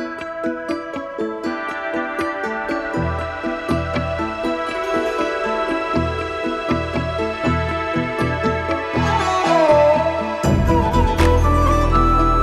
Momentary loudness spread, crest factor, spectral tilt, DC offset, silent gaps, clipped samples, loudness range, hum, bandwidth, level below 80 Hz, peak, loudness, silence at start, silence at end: 9 LU; 16 dB; -6.5 dB/octave; under 0.1%; none; under 0.1%; 7 LU; none; 13.5 kHz; -28 dBFS; -2 dBFS; -19 LUFS; 0 s; 0 s